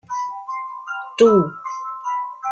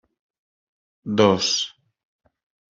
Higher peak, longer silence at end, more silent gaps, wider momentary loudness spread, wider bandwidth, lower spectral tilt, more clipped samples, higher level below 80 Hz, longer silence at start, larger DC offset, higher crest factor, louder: about the same, -2 dBFS vs -2 dBFS; second, 0 s vs 1.05 s; neither; about the same, 15 LU vs 14 LU; first, 9 kHz vs 7.8 kHz; first, -6 dB/octave vs -4 dB/octave; neither; about the same, -62 dBFS vs -64 dBFS; second, 0.1 s vs 1.05 s; neither; about the same, 18 dB vs 22 dB; about the same, -21 LUFS vs -20 LUFS